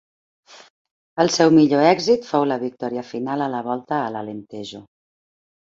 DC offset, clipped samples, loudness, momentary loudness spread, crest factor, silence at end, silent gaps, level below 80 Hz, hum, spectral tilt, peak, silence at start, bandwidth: under 0.1%; under 0.1%; -19 LUFS; 19 LU; 20 dB; 0.85 s; 0.70-0.85 s, 0.91-1.16 s; -64 dBFS; none; -5 dB/octave; -2 dBFS; 0.55 s; 7.8 kHz